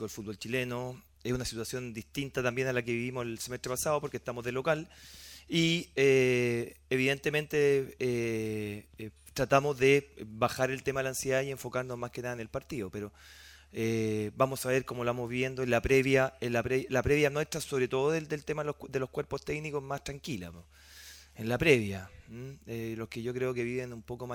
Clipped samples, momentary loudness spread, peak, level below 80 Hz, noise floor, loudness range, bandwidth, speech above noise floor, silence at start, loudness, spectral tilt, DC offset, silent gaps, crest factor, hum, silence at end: under 0.1%; 16 LU; -8 dBFS; -56 dBFS; -52 dBFS; 6 LU; 18.5 kHz; 21 dB; 0 s; -31 LUFS; -5 dB/octave; under 0.1%; none; 24 dB; none; 0 s